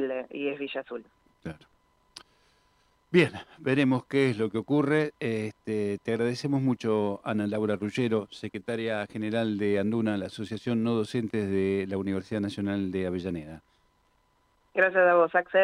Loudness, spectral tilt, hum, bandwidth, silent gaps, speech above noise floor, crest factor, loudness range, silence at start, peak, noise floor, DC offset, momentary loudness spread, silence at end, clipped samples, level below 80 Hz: -28 LUFS; -7 dB/octave; none; 11.5 kHz; none; 41 dB; 18 dB; 4 LU; 0 s; -10 dBFS; -68 dBFS; under 0.1%; 11 LU; 0 s; under 0.1%; -68 dBFS